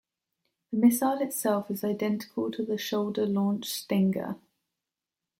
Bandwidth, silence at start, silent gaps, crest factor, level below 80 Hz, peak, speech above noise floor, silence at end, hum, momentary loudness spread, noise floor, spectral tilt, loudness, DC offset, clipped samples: 16.5 kHz; 0.7 s; none; 20 dB; -74 dBFS; -10 dBFS; 62 dB; 1.05 s; none; 9 LU; -89 dBFS; -5.5 dB/octave; -28 LUFS; under 0.1%; under 0.1%